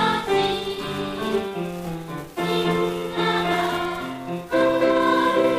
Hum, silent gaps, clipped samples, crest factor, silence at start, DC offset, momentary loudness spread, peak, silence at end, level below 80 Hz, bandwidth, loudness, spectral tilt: none; none; under 0.1%; 14 dB; 0 s; under 0.1%; 11 LU; -8 dBFS; 0 s; -50 dBFS; 15.5 kHz; -23 LUFS; -5.5 dB/octave